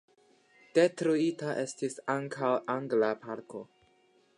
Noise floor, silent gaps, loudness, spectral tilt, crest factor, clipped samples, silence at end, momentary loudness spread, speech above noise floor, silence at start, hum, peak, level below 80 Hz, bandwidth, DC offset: -67 dBFS; none; -31 LUFS; -5.5 dB/octave; 20 dB; under 0.1%; 0.75 s; 14 LU; 37 dB; 0.75 s; none; -12 dBFS; -84 dBFS; 11.5 kHz; under 0.1%